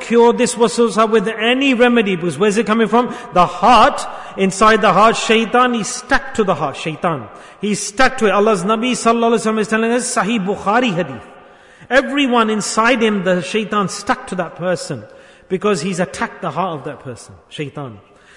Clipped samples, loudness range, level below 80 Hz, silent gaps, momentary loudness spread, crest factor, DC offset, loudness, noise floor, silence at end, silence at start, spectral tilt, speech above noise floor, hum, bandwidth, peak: under 0.1%; 7 LU; -44 dBFS; none; 14 LU; 14 dB; under 0.1%; -15 LUFS; -43 dBFS; 0.4 s; 0 s; -4 dB/octave; 27 dB; none; 11 kHz; -2 dBFS